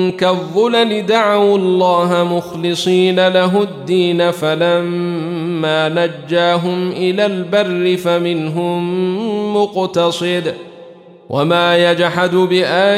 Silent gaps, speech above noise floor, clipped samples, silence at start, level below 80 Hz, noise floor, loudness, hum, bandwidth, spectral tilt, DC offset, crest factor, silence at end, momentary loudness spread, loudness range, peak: none; 24 dB; under 0.1%; 0 s; -62 dBFS; -38 dBFS; -15 LUFS; none; 14 kHz; -5.5 dB/octave; under 0.1%; 14 dB; 0 s; 7 LU; 3 LU; -2 dBFS